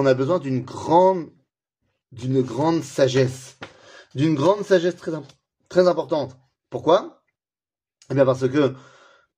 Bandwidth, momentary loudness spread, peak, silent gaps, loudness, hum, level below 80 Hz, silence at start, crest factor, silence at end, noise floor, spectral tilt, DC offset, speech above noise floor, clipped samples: 11 kHz; 17 LU; -4 dBFS; none; -21 LUFS; none; -64 dBFS; 0 s; 18 dB; 0.6 s; under -90 dBFS; -6.5 dB/octave; under 0.1%; over 70 dB; under 0.1%